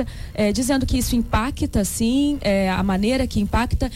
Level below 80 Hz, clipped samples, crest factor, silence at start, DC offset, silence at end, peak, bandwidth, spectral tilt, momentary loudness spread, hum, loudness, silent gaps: -30 dBFS; under 0.1%; 12 dB; 0 s; under 0.1%; 0 s; -10 dBFS; 16.5 kHz; -5 dB/octave; 3 LU; none; -21 LUFS; none